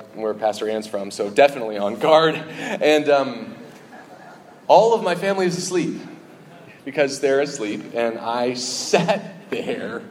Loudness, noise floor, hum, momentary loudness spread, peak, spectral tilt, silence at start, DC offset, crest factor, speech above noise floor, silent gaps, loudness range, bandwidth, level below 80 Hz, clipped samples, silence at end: -20 LUFS; -44 dBFS; none; 13 LU; 0 dBFS; -4 dB/octave; 0 s; under 0.1%; 20 dB; 24 dB; none; 4 LU; 15.5 kHz; -74 dBFS; under 0.1%; 0 s